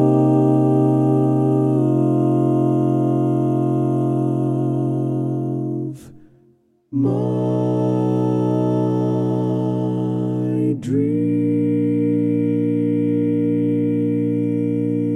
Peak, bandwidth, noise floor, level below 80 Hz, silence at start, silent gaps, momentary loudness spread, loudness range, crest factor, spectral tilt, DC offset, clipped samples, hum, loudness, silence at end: -4 dBFS; 6.6 kHz; -57 dBFS; -66 dBFS; 0 s; none; 5 LU; 5 LU; 14 dB; -10.5 dB/octave; under 0.1%; under 0.1%; none; -19 LUFS; 0 s